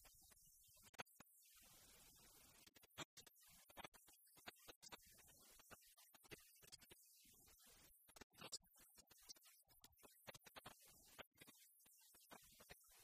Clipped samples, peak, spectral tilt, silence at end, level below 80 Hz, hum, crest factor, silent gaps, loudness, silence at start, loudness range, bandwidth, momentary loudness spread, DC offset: under 0.1%; -38 dBFS; -1.5 dB/octave; 0 s; -84 dBFS; none; 28 dB; 0.89-0.94 s, 1.02-1.06 s, 3.05-3.17 s, 3.88-3.92 s, 4.76-4.81 s, 8.23-8.30 s, 11.27-11.32 s; -64 LUFS; 0 s; 3 LU; 15 kHz; 10 LU; under 0.1%